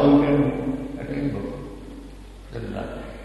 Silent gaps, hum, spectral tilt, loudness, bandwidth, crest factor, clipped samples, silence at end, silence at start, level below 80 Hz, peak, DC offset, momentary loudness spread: none; none; -8.5 dB/octave; -25 LUFS; 8.8 kHz; 18 dB; under 0.1%; 0 s; 0 s; -40 dBFS; -6 dBFS; under 0.1%; 22 LU